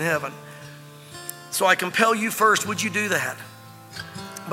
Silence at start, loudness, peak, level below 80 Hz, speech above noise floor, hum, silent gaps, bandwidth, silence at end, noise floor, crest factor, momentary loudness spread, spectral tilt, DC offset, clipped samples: 0 s; -21 LUFS; -4 dBFS; -70 dBFS; 20 dB; none; none; 17 kHz; 0 s; -43 dBFS; 22 dB; 22 LU; -3 dB/octave; under 0.1%; under 0.1%